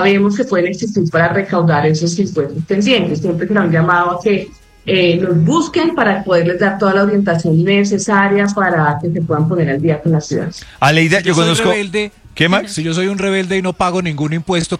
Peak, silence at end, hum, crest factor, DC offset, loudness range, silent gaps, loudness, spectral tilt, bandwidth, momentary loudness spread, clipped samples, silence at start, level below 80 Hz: 0 dBFS; 0 s; none; 14 dB; under 0.1%; 2 LU; none; -14 LUFS; -5.5 dB/octave; 12 kHz; 6 LU; under 0.1%; 0 s; -46 dBFS